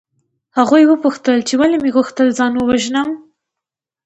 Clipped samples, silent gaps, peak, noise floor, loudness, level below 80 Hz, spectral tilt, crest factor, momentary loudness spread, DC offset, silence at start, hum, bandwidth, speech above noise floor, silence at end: under 0.1%; none; 0 dBFS; -84 dBFS; -14 LUFS; -52 dBFS; -4 dB/octave; 14 dB; 9 LU; under 0.1%; 0.55 s; none; 8.2 kHz; 71 dB; 0.9 s